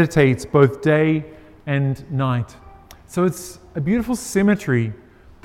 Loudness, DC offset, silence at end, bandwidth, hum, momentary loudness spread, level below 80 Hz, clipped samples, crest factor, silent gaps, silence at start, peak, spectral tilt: -20 LUFS; under 0.1%; 0.5 s; 15.5 kHz; none; 14 LU; -48 dBFS; under 0.1%; 20 dB; none; 0 s; 0 dBFS; -7 dB/octave